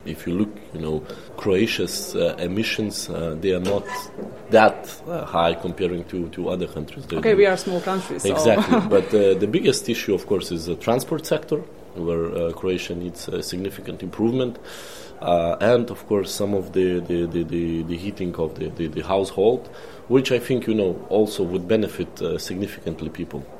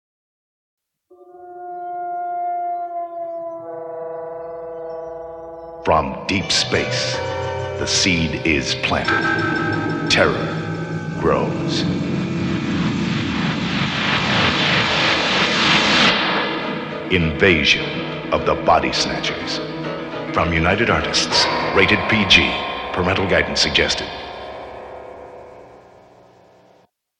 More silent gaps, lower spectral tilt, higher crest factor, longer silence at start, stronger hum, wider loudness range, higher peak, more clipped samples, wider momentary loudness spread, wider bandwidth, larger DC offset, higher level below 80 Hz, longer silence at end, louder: neither; first, -5.5 dB/octave vs -4 dB/octave; about the same, 22 dB vs 20 dB; second, 0 s vs 1.1 s; neither; second, 6 LU vs 12 LU; about the same, 0 dBFS vs 0 dBFS; neither; second, 12 LU vs 16 LU; first, 16 kHz vs 11 kHz; first, 0.6% vs under 0.1%; second, -52 dBFS vs -42 dBFS; second, 0 s vs 1.4 s; second, -23 LUFS vs -18 LUFS